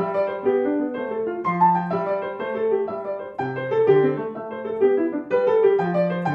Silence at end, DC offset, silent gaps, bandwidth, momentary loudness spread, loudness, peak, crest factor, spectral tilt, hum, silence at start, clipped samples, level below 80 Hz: 0 s; under 0.1%; none; 5.2 kHz; 10 LU; -22 LUFS; -6 dBFS; 16 dB; -9 dB/octave; none; 0 s; under 0.1%; -68 dBFS